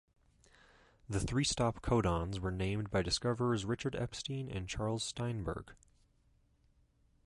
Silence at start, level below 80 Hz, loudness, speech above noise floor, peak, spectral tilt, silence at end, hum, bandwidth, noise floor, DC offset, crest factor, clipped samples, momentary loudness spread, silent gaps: 1.1 s; -50 dBFS; -36 LUFS; 36 dB; -18 dBFS; -5 dB/octave; 1.55 s; none; 11.5 kHz; -71 dBFS; under 0.1%; 20 dB; under 0.1%; 8 LU; none